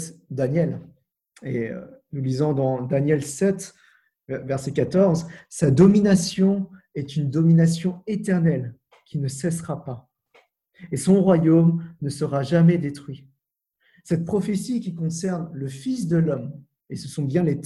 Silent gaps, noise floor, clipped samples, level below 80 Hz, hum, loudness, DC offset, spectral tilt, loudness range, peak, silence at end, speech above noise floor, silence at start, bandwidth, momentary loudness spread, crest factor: none; -76 dBFS; under 0.1%; -56 dBFS; none; -22 LUFS; under 0.1%; -7 dB/octave; 6 LU; -4 dBFS; 0 s; 55 dB; 0 s; 12 kHz; 17 LU; 20 dB